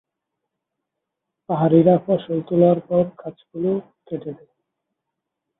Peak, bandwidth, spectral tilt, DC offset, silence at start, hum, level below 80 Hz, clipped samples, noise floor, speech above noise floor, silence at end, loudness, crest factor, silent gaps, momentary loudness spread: -2 dBFS; 4 kHz; -13.5 dB/octave; under 0.1%; 1.5 s; none; -62 dBFS; under 0.1%; -81 dBFS; 62 dB; 1.25 s; -19 LUFS; 20 dB; none; 18 LU